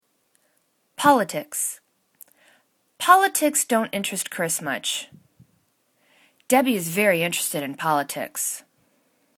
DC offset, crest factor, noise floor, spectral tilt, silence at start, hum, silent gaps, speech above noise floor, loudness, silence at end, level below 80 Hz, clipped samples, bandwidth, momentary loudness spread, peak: under 0.1%; 24 dB; -68 dBFS; -2.5 dB/octave; 1 s; none; none; 46 dB; -22 LUFS; 0.8 s; -74 dBFS; under 0.1%; 19 kHz; 11 LU; -2 dBFS